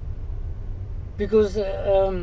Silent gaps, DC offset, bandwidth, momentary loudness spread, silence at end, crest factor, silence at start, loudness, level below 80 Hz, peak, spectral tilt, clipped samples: none; 0.4%; 7.8 kHz; 14 LU; 0 s; 16 dB; 0 s; -24 LUFS; -32 dBFS; -8 dBFS; -8 dB/octave; under 0.1%